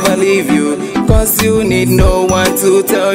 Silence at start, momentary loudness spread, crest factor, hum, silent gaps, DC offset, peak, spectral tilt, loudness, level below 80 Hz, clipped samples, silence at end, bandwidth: 0 s; 3 LU; 10 dB; none; none; under 0.1%; 0 dBFS; -5 dB/octave; -11 LUFS; -20 dBFS; under 0.1%; 0 s; 16.5 kHz